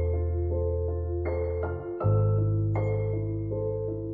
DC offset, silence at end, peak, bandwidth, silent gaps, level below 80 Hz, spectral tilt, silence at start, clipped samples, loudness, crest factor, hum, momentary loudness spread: under 0.1%; 0 s; -14 dBFS; 2.3 kHz; none; -40 dBFS; -13 dB/octave; 0 s; under 0.1%; -29 LUFS; 12 dB; none; 6 LU